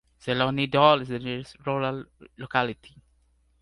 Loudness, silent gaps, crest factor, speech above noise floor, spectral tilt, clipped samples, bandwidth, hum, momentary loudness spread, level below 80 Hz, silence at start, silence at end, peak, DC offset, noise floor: -25 LUFS; none; 24 dB; 39 dB; -6.5 dB/octave; under 0.1%; 11.5 kHz; none; 16 LU; -58 dBFS; 0.25 s; 0.75 s; -4 dBFS; under 0.1%; -65 dBFS